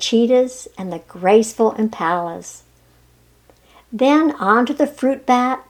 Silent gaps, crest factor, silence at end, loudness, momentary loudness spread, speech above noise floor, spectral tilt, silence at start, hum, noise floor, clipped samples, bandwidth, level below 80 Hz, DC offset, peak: none; 18 dB; 0.1 s; -17 LUFS; 15 LU; 36 dB; -4.5 dB/octave; 0 s; none; -53 dBFS; under 0.1%; 15 kHz; -58 dBFS; under 0.1%; 0 dBFS